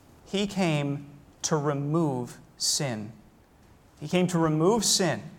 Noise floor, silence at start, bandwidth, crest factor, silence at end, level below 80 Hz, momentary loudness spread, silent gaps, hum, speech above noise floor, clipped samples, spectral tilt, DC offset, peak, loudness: -56 dBFS; 0.3 s; 17 kHz; 18 dB; 0 s; -60 dBFS; 14 LU; none; none; 30 dB; under 0.1%; -4 dB/octave; under 0.1%; -10 dBFS; -26 LUFS